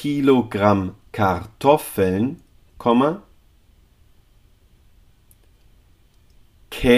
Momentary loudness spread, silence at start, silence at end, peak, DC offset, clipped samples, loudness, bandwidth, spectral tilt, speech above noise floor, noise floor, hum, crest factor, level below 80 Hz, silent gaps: 12 LU; 0 s; 0 s; -2 dBFS; under 0.1%; under 0.1%; -20 LUFS; 15.5 kHz; -6.5 dB/octave; 36 dB; -54 dBFS; none; 20 dB; -44 dBFS; none